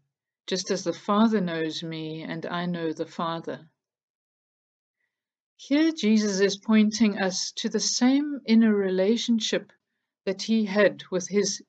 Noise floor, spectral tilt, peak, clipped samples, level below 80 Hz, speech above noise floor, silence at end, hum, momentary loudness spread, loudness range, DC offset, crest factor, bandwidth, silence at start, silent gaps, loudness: -82 dBFS; -4.5 dB/octave; -8 dBFS; under 0.1%; -76 dBFS; 58 dB; 0.1 s; none; 12 LU; 11 LU; under 0.1%; 18 dB; 8.2 kHz; 0.5 s; 4.03-4.94 s, 5.40-5.56 s; -25 LUFS